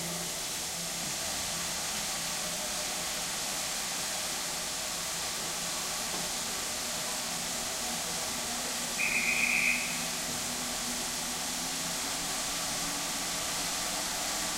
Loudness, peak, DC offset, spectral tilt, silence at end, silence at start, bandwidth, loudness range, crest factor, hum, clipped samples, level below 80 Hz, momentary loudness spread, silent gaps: -31 LUFS; -16 dBFS; under 0.1%; -0.5 dB/octave; 0 s; 0 s; 16 kHz; 3 LU; 18 dB; none; under 0.1%; -56 dBFS; 5 LU; none